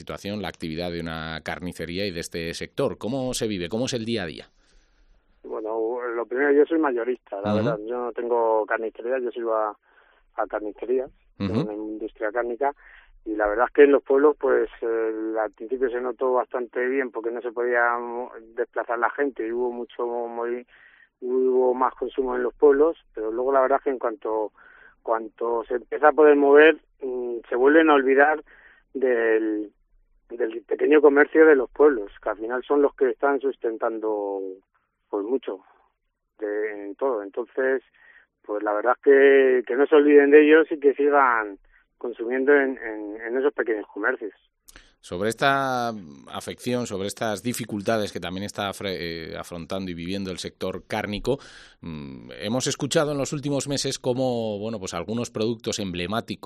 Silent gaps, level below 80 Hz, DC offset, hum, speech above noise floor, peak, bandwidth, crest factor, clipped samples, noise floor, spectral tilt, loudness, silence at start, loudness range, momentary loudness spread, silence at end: none; -56 dBFS; under 0.1%; none; 52 dB; -2 dBFS; 13 kHz; 20 dB; under 0.1%; -75 dBFS; -5 dB/octave; -23 LUFS; 0 s; 11 LU; 15 LU; 0.1 s